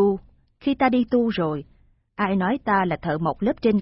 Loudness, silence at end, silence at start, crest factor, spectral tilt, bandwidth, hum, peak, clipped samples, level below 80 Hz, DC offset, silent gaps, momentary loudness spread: -23 LUFS; 0 s; 0 s; 16 dB; -11.5 dB/octave; 5.8 kHz; none; -6 dBFS; under 0.1%; -50 dBFS; under 0.1%; none; 9 LU